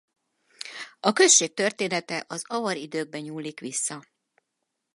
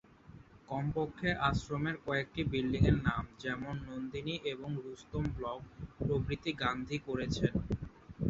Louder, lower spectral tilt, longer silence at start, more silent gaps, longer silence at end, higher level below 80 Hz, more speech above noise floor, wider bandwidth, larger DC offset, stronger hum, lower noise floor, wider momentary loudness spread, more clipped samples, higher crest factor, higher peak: first, -24 LUFS vs -36 LUFS; second, -1.5 dB/octave vs -5.5 dB/octave; first, 0.6 s vs 0.25 s; neither; first, 0.95 s vs 0 s; second, -82 dBFS vs -48 dBFS; first, 55 dB vs 21 dB; first, 11.5 kHz vs 7.6 kHz; neither; neither; first, -81 dBFS vs -56 dBFS; first, 20 LU vs 10 LU; neither; about the same, 24 dB vs 22 dB; first, -4 dBFS vs -14 dBFS